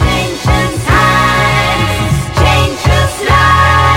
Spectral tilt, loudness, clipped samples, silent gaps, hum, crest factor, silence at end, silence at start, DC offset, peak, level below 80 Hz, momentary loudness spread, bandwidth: -4.5 dB/octave; -10 LUFS; under 0.1%; none; none; 10 dB; 0 s; 0 s; under 0.1%; 0 dBFS; -20 dBFS; 5 LU; 17 kHz